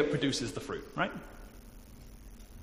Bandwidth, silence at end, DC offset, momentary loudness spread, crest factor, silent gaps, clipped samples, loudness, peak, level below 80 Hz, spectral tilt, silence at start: 15.5 kHz; 0 s; under 0.1%; 22 LU; 22 dB; none; under 0.1%; -35 LUFS; -14 dBFS; -52 dBFS; -4.5 dB/octave; 0 s